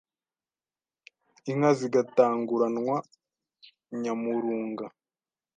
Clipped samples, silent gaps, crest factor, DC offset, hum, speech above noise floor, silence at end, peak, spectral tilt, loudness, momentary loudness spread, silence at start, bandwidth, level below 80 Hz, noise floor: under 0.1%; none; 22 dB; under 0.1%; none; over 64 dB; 0.7 s; -8 dBFS; -7 dB/octave; -27 LUFS; 15 LU; 1.45 s; 9.4 kHz; -82 dBFS; under -90 dBFS